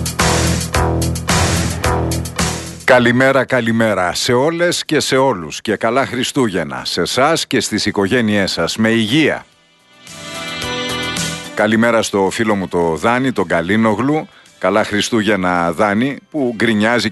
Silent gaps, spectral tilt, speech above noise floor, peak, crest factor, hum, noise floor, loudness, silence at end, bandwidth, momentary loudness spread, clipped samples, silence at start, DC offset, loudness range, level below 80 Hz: none; -4.5 dB/octave; 35 dB; 0 dBFS; 16 dB; none; -49 dBFS; -15 LUFS; 0 s; 12.5 kHz; 7 LU; under 0.1%; 0 s; under 0.1%; 3 LU; -34 dBFS